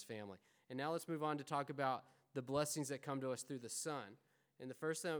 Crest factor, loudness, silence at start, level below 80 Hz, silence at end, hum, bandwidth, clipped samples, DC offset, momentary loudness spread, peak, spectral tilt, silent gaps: 20 dB; -44 LUFS; 0 s; -84 dBFS; 0 s; none; over 20 kHz; under 0.1%; under 0.1%; 12 LU; -24 dBFS; -4.5 dB/octave; none